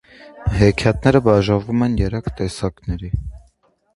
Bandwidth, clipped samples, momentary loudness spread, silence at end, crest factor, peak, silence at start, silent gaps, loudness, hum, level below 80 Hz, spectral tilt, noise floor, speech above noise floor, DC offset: 11.5 kHz; under 0.1%; 12 LU; 0.55 s; 18 dB; 0 dBFS; 0.25 s; none; -19 LUFS; none; -30 dBFS; -7 dB/octave; -59 dBFS; 42 dB; under 0.1%